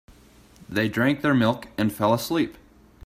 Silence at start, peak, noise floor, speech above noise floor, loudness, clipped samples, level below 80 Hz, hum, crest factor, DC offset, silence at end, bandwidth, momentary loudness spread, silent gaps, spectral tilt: 0.6 s; -8 dBFS; -52 dBFS; 30 dB; -24 LUFS; under 0.1%; -56 dBFS; none; 18 dB; under 0.1%; 0.55 s; 16 kHz; 6 LU; none; -6 dB/octave